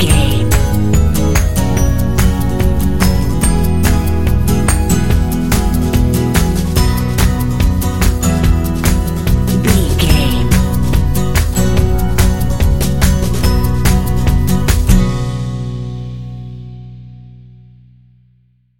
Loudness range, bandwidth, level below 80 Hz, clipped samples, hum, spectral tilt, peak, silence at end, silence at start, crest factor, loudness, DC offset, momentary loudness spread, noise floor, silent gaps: 4 LU; 17 kHz; -16 dBFS; under 0.1%; 60 Hz at -35 dBFS; -5.5 dB/octave; 0 dBFS; 1.35 s; 0 s; 12 dB; -14 LUFS; under 0.1%; 7 LU; -53 dBFS; none